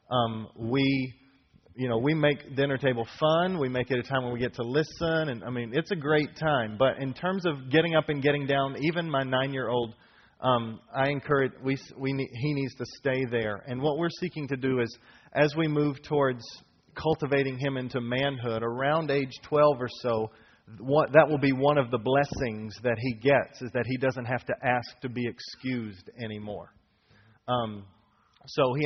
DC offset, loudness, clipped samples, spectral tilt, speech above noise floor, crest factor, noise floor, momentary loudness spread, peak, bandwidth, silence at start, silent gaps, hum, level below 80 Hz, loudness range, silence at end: under 0.1%; -28 LUFS; under 0.1%; -4.5 dB/octave; 36 dB; 24 dB; -63 dBFS; 10 LU; -4 dBFS; 6.4 kHz; 0.1 s; none; none; -60 dBFS; 5 LU; 0 s